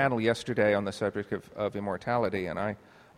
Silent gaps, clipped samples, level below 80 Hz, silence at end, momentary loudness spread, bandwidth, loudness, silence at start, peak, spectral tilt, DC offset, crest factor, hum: none; under 0.1%; -62 dBFS; 0.4 s; 9 LU; 14 kHz; -30 LUFS; 0 s; -10 dBFS; -6 dB/octave; under 0.1%; 20 dB; none